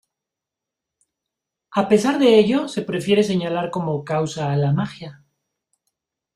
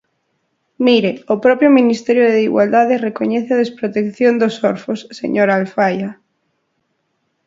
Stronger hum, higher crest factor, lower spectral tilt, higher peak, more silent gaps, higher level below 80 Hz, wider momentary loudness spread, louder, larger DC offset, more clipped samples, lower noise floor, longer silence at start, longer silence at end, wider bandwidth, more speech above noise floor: neither; about the same, 20 dB vs 16 dB; about the same, -6.5 dB/octave vs -6.5 dB/octave; about the same, -2 dBFS vs 0 dBFS; neither; first, -60 dBFS vs -66 dBFS; first, 11 LU vs 8 LU; second, -20 LUFS vs -15 LUFS; neither; neither; first, -86 dBFS vs -68 dBFS; first, 1.7 s vs 0.8 s; about the same, 1.25 s vs 1.35 s; first, 12.5 kHz vs 7.6 kHz; first, 67 dB vs 54 dB